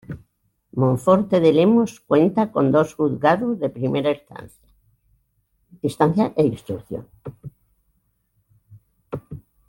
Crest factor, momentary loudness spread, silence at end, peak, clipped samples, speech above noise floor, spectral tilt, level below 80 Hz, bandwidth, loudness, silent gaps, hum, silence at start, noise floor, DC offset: 18 dB; 22 LU; 0.3 s; -2 dBFS; under 0.1%; 49 dB; -8 dB/octave; -56 dBFS; 17 kHz; -20 LUFS; none; none; 0.1 s; -68 dBFS; under 0.1%